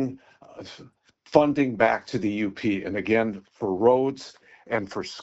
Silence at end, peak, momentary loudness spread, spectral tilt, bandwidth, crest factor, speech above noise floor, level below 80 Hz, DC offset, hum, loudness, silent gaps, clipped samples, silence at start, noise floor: 0 s; -2 dBFS; 21 LU; -5 dB/octave; 8 kHz; 22 dB; 20 dB; -60 dBFS; under 0.1%; none; -24 LUFS; none; under 0.1%; 0 s; -45 dBFS